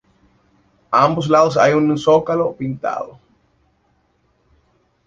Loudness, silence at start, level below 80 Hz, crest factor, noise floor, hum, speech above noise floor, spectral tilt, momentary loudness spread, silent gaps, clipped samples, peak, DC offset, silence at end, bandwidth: -16 LUFS; 0.9 s; -56 dBFS; 18 dB; -62 dBFS; none; 46 dB; -6.5 dB/octave; 11 LU; none; under 0.1%; 0 dBFS; under 0.1%; 1.95 s; 7.6 kHz